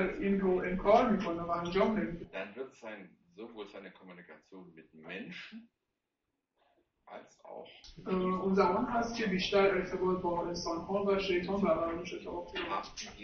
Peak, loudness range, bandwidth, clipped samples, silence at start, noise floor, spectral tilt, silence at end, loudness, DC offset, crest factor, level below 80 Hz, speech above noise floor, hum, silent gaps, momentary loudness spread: -14 dBFS; 18 LU; 6.8 kHz; under 0.1%; 0 s; -86 dBFS; -6 dB/octave; 0 s; -32 LUFS; under 0.1%; 20 dB; -56 dBFS; 53 dB; none; none; 23 LU